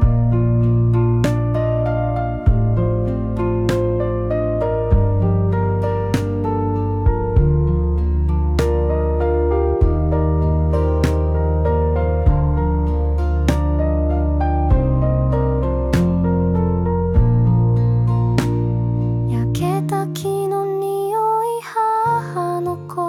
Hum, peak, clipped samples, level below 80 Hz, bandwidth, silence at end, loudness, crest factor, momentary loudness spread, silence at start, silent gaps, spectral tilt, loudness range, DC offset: none; -4 dBFS; under 0.1%; -22 dBFS; 13 kHz; 0 s; -18 LUFS; 12 dB; 4 LU; 0 s; none; -8.5 dB/octave; 2 LU; under 0.1%